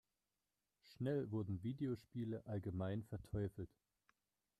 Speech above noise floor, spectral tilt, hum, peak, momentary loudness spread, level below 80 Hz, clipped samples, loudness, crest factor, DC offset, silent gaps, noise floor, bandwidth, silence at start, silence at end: over 46 dB; -9 dB/octave; none; -32 dBFS; 5 LU; -70 dBFS; under 0.1%; -46 LUFS; 14 dB; under 0.1%; none; under -90 dBFS; 13 kHz; 0.85 s; 0.95 s